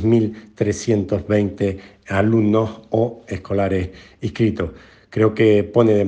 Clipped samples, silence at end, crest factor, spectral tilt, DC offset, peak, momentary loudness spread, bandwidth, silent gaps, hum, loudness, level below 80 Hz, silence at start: under 0.1%; 0 s; 16 dB; -7.5 dB/octave; under 0.1%; -2 dBFS; 13 LU; 9.2 kHz; none; none; -20 LUFS; -50 dBFS; 0 s